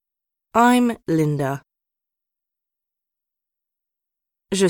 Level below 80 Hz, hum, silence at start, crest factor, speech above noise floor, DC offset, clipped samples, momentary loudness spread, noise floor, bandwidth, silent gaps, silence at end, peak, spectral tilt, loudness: -60 dBFS; none; 0.55 s; 20 dB; 67 dB; under 0.1%; under 0.1%; 11 LU; -85 dBFS; 18 kHz; none; 0 s; -4 dBFS; -5.5 dB/octave; -20 LUFS